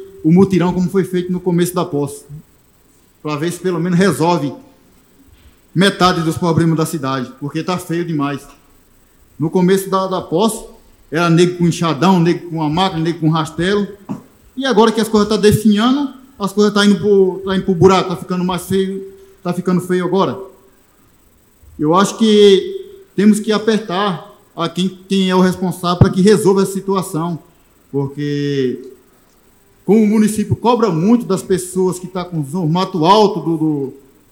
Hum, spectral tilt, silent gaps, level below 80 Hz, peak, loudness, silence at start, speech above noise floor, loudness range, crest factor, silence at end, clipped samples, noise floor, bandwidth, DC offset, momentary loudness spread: none; -6 dB/octave; none; -46 dBFS; 0 dBFS; -15 LUFS; 0 s; 37 dB; 5 LU; 16 dB; 0.35 s; under 0.1%; -51 dBFS; 17 kHz; under 0.1%; 12 LU